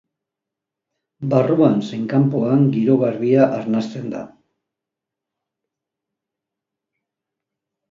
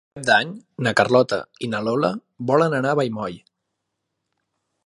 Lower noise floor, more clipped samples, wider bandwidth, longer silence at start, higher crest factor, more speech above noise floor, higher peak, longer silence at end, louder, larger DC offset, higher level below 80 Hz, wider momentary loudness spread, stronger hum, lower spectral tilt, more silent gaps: first, -85 dBFS vs -78 dBFS; neither; second, 7.4 kHz vs 11.5 kHz; first, 1.2 s vs 0.15 s; about the same, 18 dB vs 22 dB; first, 68 dB vs 58 dB; about the same, -2 dBFS vs 0 dBFS; first, 3.65 s vs 1.5 s; first, -17 LUFS vs -21 LUFS; neither; about the same, -66 dBFS vs -62 dBFS; about the same, 13 LU vs 12 LU; neither; first, -9 dB/octave vs -5.5 dB/octave; neither